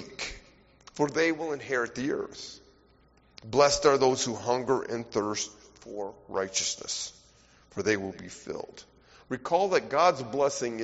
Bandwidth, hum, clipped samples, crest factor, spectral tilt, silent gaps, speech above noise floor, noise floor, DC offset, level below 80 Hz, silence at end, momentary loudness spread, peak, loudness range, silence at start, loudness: 8 kHz; none; under 0.1%; 22 dB; -3 dB/octave; none; 33 dB; -62 dBFS; under 0.1%; -60 dBFS; 0 s; 16 LU; -8 dBFS; 6 LU; 0 s; -28 LUFS